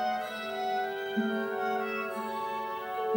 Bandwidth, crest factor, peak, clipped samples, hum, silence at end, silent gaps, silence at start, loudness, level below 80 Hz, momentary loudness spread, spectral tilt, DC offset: over 20 kHz; 14 dB; -18 dBFS; under 0.1%; none; 0 s; none; 0 s; -33 LUFS; -76 dBFS; 4 LU; -5 dB/octave; under 0.1%